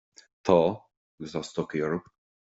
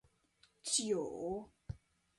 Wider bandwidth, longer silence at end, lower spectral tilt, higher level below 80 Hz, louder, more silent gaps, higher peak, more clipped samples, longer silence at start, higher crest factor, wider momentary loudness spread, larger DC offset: second, 8 kHz vs 11.5 kHz; about the same, 0.4 s vs 0.4 s; first, -6.5 dB/octave vs -3 dB/octave; about the same, -64 dBFS vs -64 dBFS; first, -28 LUFS vs -38 LUFS; first, 0.97-1.18 s vs none; first, -8 dBFS vs -20 dBFS; neither; second, 0.45 s vs 0.65 s; about the same, 22 dB vs 22 dB; about the same, 16 LU vs 18 LU; neither